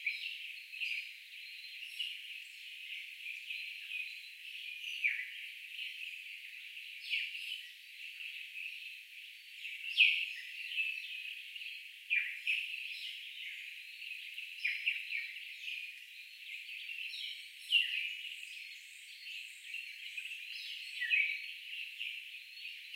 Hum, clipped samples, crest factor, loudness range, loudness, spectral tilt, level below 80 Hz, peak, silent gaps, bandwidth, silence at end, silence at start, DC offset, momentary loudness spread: none; under 0.1%; 26 dB; 7 LU; -38 LUFS; 9.5 dB/octave; under -90 dBFS; -14 dBFS; none; 16 kHz; 0 s; 0 s; under 0.1%; 14 LU